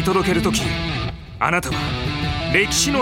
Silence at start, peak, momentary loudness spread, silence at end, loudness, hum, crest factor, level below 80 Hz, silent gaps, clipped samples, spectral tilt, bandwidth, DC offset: 0 s; -2 dBFS; 7 LU; 0 s; -20 LUFS; none; 18 dB; -34 dBFS; none; under 0.1%; -4 dB/octave; 16.5 kHz; under 0.1%